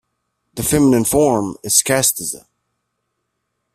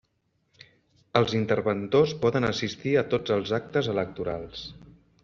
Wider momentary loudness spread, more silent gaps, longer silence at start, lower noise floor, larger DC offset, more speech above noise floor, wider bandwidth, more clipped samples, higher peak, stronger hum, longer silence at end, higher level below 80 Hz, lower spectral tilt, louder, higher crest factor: about the same, 12 LU vs 10 LU; neither; second, 0.55 s vs 1.15 s; about the same, -74 dBFS vs -73 dBFS; neither; first, 58 dB vs 47 dB; first, 16 kHz vs 7.4 kHz; neither; first, 0 dBFS vs -4 dBFS; neither; first, 1.35 s vs 0.35 s; first, -44 dBFS vs -58 dBFS; about the same, -3.5 dB/octave vs -4.5 dB/octave; first, -15 LUFS vs -26 LUFS; about the same, 18 dB vs 22 dB